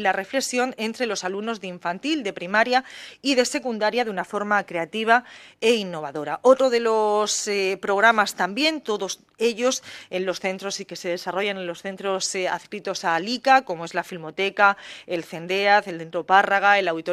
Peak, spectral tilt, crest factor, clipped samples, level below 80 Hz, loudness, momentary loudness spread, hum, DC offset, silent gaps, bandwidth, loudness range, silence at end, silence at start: -2 dBFS; -2.5 dB/octave; 20 dB; under 0.1%; -72 dBFS; -23 LUFS; 12 LU; none; under 0.1%; none; 15 kHz; 6 LU; 0 s; 0 s